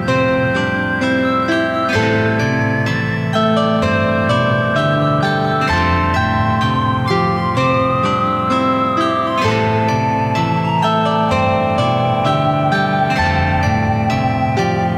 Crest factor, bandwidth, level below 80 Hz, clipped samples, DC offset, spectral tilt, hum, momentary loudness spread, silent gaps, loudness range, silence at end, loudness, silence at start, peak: 12 dB; 13 kHz; -38 dBFS; under 0.1%; under 0.1%; -6.5 dB/octave; none; 2 LU; none; 1 LU; 0 s; -15 LUFS; 0 s; -4 dBFS